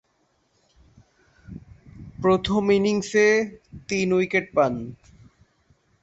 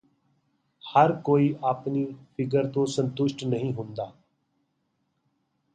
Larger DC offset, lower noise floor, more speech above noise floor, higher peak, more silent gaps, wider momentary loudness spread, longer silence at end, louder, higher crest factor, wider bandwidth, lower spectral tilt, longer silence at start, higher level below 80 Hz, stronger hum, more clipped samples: neither; second, -68 dBFS vs -75 dBFS; about the same, 47 dB vs 50 dB; about the same, -8 dBFS vs -6 dBFS; neither; first, 24 LU vs 13 LU; second, 1.1 s vs 1.65 s; first, -22 LUFS vs -26 LUFS; about the same, 18 dB vs 22 dB; second, 8.2 kHz vs 9.2 kHz; second, -5.5 dB/octave vs -7 dB/octave; first, 1.5 s vs 0.85 s; first, -52 dBFS vs -68 dBFS; neither; neither